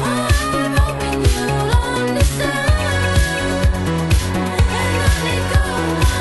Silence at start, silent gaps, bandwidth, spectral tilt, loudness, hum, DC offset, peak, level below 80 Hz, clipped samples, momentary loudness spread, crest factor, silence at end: 0 s; none; 12.5 kHz; -5 dB/octave; -17 LUFS; none; under 0.1%; -2 dBFS; -20 dBFS; under 0.1%; 2 LU; 14 dB; 0 s